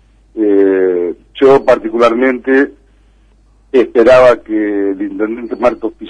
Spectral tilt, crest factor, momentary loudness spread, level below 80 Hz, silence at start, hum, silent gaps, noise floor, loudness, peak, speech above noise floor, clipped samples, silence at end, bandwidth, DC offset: -6 dB/octave; 12 dB; 11 LU; -44 dBFS; 0.35 s; none; none; -47 dBFS; -11 LUFS; 0 dBFS; 37 dB; under 0.1%; 0 s; 9.6 kHz; under 0.1%